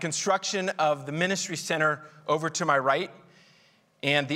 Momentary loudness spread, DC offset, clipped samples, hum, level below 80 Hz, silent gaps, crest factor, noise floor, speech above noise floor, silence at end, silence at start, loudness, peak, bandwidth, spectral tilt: 5 LU; under 0.1%; under 0.1%; none; -76 dBFS; none; 20 dB; -62 dBFS; 35 dB; 0 s; 0 s; -27 LUFS; -8 dBFS; 16 kHz; -3.5 dB/octave